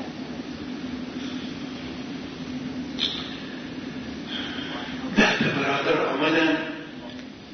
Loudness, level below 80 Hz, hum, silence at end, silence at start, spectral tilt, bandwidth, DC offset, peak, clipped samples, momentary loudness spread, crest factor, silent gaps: -27 LUFS; -54 dBFS; none; 0 s; 0 s; -4.5 dB/octave; 6.6 kHz; under 0.1%; -6 dBFS; under 0.1%; 14 LU; 22 dB; none